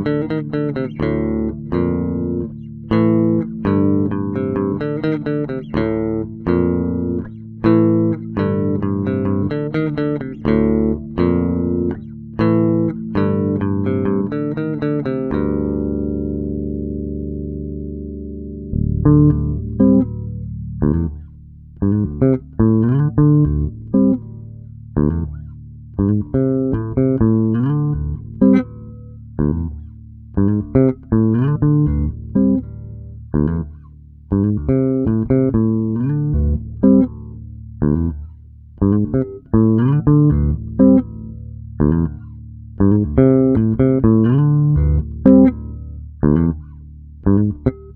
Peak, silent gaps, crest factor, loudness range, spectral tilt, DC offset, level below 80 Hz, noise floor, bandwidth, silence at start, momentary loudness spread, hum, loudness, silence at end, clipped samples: 0 dBFS; none; 16 dB; 5 LU; -12.5 dB/octave; under 0.1%; -30 dBFS; -40 dBFS; 4.4 kHz; 0 s; 16 LU; none; -17 LUFS; 0 s; under 0.1%